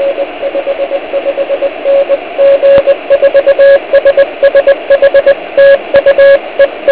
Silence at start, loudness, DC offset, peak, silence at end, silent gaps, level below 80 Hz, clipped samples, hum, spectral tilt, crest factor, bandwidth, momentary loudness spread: 0 s; -8 LUFS; 0.6%; 0 dBFS; 0 s; none; -44 dBFS; 3%; none; -7 dB/octave; 8 dB; 4 kHz; 9 LU